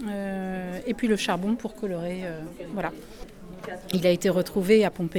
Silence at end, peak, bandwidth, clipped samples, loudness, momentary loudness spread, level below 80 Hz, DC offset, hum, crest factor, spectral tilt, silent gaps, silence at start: 0 s; -8 dBFS; 19.5 kHz; under 0.1%; -26 LUFS; 18 LU; -50 dBFS; under 0.1%; none; 18 dB; -5.5 dB/octave; none; 0 s